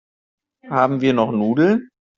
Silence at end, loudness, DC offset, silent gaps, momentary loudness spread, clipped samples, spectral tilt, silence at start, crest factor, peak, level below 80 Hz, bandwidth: 0.35 s; -18 LUFS; under 0.1%; none; 5 LU; under 0.1%; -6 dB/octave; 0.65 s; 16 dB; -2 dBFS; -60 dBFS; 7.2 kHz